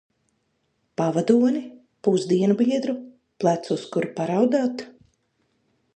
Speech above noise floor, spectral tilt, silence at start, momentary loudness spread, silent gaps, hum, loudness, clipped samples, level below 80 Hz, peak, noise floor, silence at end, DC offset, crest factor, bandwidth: 50 dB; -7 dB/octave; 1 s; 14 LU; none; none; -23 LUFS; under 0.1%; -72 dBFS; -4 dBFS; -71 dBFS; 1.05 s; under 0.1%; 20 dB; 9.2 kHz